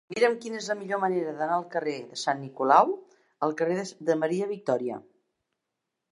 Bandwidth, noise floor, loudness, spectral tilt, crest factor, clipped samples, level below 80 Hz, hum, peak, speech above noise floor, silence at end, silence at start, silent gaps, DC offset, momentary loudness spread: 11.5 kHz; -84 dBFS; -27 LUFS; -5 dB/octave; 24 dB; under 0.1%; -82 dBFS; none; -4 dBFS; 57 dB; 1.1 s; 0.1 s; none; under 0.1%; 11 LU